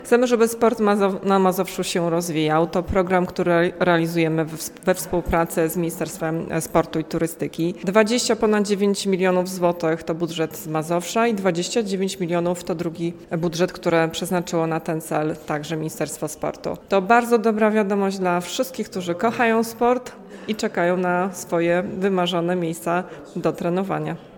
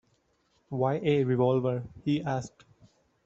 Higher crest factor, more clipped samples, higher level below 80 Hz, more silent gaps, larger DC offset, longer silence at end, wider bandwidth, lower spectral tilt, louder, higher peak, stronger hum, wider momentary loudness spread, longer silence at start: about the same, 20 dB vs 18 dB; neither; first, -48 dBFS vs -64 dBFS; neither; neither; second, 0 s vs 0.75 s; first, 18 kHz vs 7.8 kHz; second, -5 dB/octave vs -8 dB/octave; first, -22 LUFS vs -29 LUFS; first, -2 dBFS vs -12 dBFS; neither; about the same, 8 LU vs 10 LU; second, 0 s vs 0.7 s